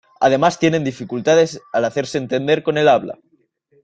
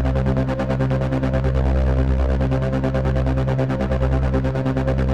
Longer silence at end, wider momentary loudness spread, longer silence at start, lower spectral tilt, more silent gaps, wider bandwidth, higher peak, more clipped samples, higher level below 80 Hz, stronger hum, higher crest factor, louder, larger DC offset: first, 0.7 s vs 0 s; first, 8 LU vs 2 LU; first, 0.2 s vs 0 s; second, -5 dB/octave vs -9 dB/octave; neither; first, 9 kHz vs 7.2 kHz; first, -2 dBFS vs -8 dBFS; neither; second, -58 dBFS vs -24 dBFS; neither; about the same, 16 dB vs 12 dB; first, -17 LUFS vs -21 LUFS; neither